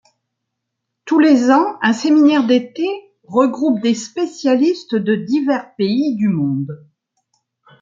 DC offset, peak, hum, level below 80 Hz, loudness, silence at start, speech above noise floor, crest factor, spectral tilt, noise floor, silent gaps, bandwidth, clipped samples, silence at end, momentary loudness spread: under 0.1%; -2 dBFS; none; -66 dBFS; -16 LUFS; 1.05 s; 62 dB; 14 dB; -6 dB/octave; -77 dBFS; none; 7.6 kHz; under 0.1%; 1.05 s; 11 LU